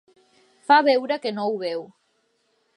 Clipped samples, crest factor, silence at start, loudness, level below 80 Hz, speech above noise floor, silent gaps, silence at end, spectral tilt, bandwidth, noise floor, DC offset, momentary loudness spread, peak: under 0.1%; 22 dB; 0.7 s; -21 LUFS; -84 dBFS; 48 dB; none; 0.9 s; -5 dB/octave; 11 kHz; -69 dBFS; under 0.1%; 15 LU; -2 dBFS